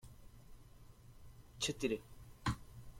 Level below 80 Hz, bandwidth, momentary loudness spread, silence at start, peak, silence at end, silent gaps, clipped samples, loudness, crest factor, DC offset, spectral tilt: -58 dBFS; 16.5 kHz; 24 LU; 0.05 s; -24 dBFS; 0 s; none; under 0.1%; -41 LUFS; 22 dB; under 0.1%; -4 dB/octave